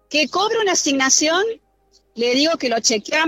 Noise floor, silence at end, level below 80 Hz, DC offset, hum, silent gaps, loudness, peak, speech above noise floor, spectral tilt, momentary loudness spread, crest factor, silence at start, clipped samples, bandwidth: -59 dBFS; 0 s; -64 dBFS; under 0.1%; 50 Hz at -65 dBFS; none; -17 LUFS; -2 dBFS; 41 dB; -0.5 dB/octave; 8 LU; 18 dB; 0.1 s; under 0.1%; 16.5 kHz